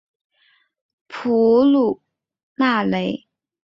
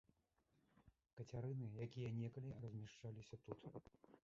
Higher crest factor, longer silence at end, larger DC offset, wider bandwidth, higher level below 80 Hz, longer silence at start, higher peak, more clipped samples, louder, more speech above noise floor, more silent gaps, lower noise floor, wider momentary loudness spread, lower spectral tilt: about the same, 16 dB vs 18 dB; first, 0.55 s vs 0.05 s; neither; about the same, 7 kHz vs 7.4 kHz; first, -62 dBFS vs -76 dBFS; first, 1.1 s vs 0.75 s; first, -6 dBFS vs -36 dBFS; neither; first, -18 LUFS vs -53 LUFS; first, 45 dB vs 32 dB; first, 2.43-2.56 s vs 1.13-1.17 s; second, -61 dBFS vs -84 dBFS; first, 18 LU vs 11 LU; about the same, -7.5 dB/octave vs -8 dB/octave